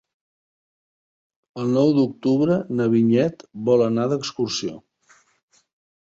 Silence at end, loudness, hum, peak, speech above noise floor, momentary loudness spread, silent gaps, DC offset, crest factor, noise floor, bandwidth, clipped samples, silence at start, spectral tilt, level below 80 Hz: 1.35 s; -21 LUFS; none; -6 dBFS; 38 dB; 10 LU; none; under 0.1%; 18 dB; -58 dBFS; 7.8 kHz; under 0.1%; 1.55 s; -6.5 dB/octave; -62 dBFS